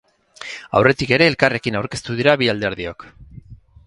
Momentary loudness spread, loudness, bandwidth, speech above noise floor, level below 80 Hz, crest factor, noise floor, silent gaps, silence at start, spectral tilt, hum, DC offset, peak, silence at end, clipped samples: 17 LU; -17 LUFS; 11.5 kHz; 24 dB; -48 dBFS; 20 dB; -42 dBFS; none; 0.4 s; -5.5 dB/octave; none; under 0.1%; 0 dBFS; 0.3 s; under 0.1%